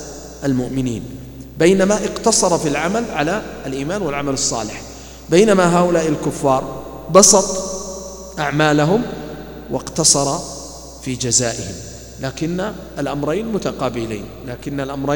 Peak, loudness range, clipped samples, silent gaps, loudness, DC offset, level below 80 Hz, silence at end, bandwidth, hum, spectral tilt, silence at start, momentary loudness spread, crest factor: 0 dBFS; 7 LU; under 0.1%; none; -17 LUFS; under 0.1%; -42 dBFS; 0 s; 19 kHz; none; -3.5 dB/octave; 0 s; 18 LU; 18 dB